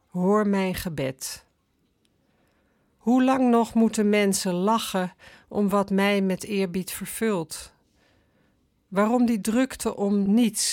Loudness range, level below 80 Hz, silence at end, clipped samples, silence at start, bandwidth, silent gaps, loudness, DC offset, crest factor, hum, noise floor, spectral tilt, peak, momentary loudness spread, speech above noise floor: 5 LU; -58 dBFS; 0 s; under 0.1%; 0.15 s; 17.5 kHz; none; -24 LUFS; under 0.1%; 14 dB; none; -69 dBFS; -5 dB/octave; -10 dBFS; 11 LU; 46 dB